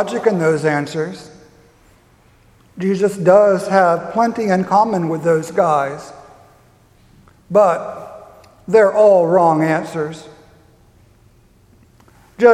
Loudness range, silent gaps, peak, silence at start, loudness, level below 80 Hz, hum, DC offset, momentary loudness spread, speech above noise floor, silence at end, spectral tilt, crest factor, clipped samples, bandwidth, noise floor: 5 LU; none; 0 dBFS; 0 s; -15 LUFS; -58 dBFS; none; under 0.1%; 17 LU; 36 dB; 0 s; -6.5 dB/octave; 16 dB; under 0.1%; 13.5 kHz; -51 dBFS